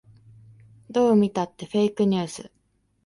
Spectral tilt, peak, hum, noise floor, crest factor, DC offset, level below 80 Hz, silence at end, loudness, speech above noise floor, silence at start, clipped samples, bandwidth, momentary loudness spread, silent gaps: -6.5 dB/octave; -8 dBFS; none; -51 dBFS; 16 dB; under 0.1%; -64 dBFS; 0.6 s; -23 LUFS; 29 dB; 0.9 s; under 0.1%; 11.5 kHz; 11 LU; none